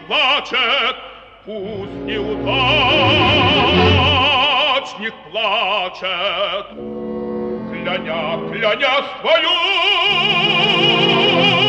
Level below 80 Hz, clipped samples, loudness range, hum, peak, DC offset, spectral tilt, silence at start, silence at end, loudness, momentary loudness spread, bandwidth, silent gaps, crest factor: -42 dBFS; under 0.1%; 7 LU; none; 0 dBFS; under 0.1%; -5 dB/octave; 0 s; 0 s; -15 LUFS; 14 LU; 8.8 kHz; none; 16 dB